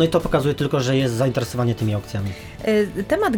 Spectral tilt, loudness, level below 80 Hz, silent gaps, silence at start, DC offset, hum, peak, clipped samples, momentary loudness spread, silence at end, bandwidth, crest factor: -6.5 dB/octave; -21 LUFS; -42 dBFS; none; 0 s; under 0.1%; none; -6 dBFS; under 0.1%; 8 LU; 0 s; 18.5 kHz; 14 dB